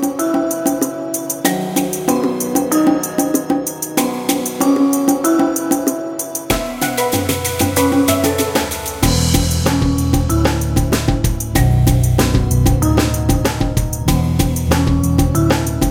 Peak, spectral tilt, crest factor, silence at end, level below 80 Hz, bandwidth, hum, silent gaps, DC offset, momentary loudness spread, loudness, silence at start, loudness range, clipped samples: 0 dBFS; -5 dB/octave; 16 dB; 0 s; -24 dBFS; 17 kHz; none; none; under 0.1%; 5 LU; -16 LUFS; 0 s; 2 LU; under 0.1%